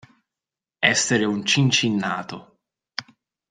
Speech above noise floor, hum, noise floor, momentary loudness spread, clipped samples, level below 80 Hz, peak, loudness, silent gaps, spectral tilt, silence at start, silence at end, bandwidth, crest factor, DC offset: 68 dB; none; -89 dBFS; 17 LU; under 0.1%; -64 dBFS; -2 dBFS; -20 LUFS; none; -3.5 dB/octave; 0.8 s; 0.5 s; 10 kHz; 22 dB; under 0.1%